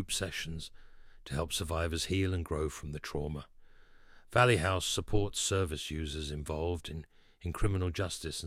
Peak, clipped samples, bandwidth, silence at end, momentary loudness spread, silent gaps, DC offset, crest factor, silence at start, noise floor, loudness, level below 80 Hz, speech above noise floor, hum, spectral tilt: -10 dBFS; under 0.1%; 16 kHz; 0 s; 13 LU; none; under 0.1%; 24 dB; 0 s; -56 dBFS; -34 LUFS; -44 dBFS; 23 dB; none; -4 dB/octave